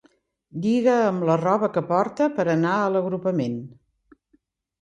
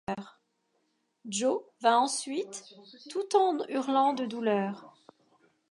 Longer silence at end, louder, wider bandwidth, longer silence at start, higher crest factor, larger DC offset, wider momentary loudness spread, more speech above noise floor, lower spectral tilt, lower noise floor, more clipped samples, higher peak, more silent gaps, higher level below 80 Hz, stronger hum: first, 1.1 s vs 0.8 s; first, -22 LUFS vs -29 LUFS; second, 9.6 kHz vs 11.5 kHz; first, 0.55 s vs 0.1 s; about the same, 16 dB vs 20 dB; neither; second, 8 LU vs 15 LU; about the same, 44 dB vs 47 dB; first, -7.5 dB/octave vs -3.5 dB/octave; second, -66 dBFS vs -76 dBFS; neither; first, -6 dBFS vs -12 dBFS; neither; first, -66 dBFS vs -76 dBFS; neither